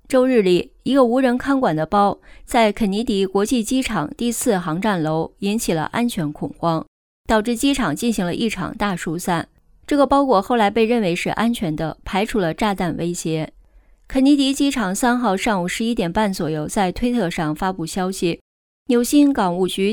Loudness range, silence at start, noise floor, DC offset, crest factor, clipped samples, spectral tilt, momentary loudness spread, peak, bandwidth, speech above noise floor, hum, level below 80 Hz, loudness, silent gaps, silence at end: 3 LU; 0.1 s; -51 dBFS; under 0.1%; 16 dB; under 0.1%; -5 dB/octave; 8 LU; -4 dBFS; 19 kHz; 32 dB; none; -42 dBFS; -19 LUFS; 6.88-7.24 s, 18.41-18.86 s; 0 s